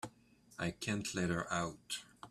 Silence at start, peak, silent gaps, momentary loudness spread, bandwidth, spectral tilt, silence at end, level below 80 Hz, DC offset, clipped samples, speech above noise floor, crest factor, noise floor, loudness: 0.05 s; -22 dBFS; none; 9 LU; 14 kHz; -4 dB/octave; 0 s; -66 dBFS; under 0.1%; under 0.1%; 26 dB; 20 dB; -65 dBFS; -39 LUFS